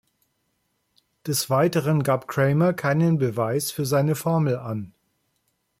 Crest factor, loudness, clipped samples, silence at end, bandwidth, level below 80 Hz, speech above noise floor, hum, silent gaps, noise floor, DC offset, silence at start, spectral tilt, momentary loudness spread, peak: 14 dB; -23 LUFS; under 0.1%; 0.9 s; 16.5 kHz; -62 dBFS; 51 dB; none; none; -73 dBFS; under 0.1%; 1.25 s; -6 dB/octave; 8 LU; -8 dBFS